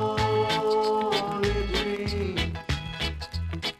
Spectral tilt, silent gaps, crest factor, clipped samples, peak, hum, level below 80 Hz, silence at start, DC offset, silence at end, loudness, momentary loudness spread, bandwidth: -5 dB/octave; none; 16 dB; under 0.1%; -12 dBFS; none; -38 dBFS; 0 s; under 0.1%; 0.05 s; -27 LUFS; 7 LU; 15.5 kHz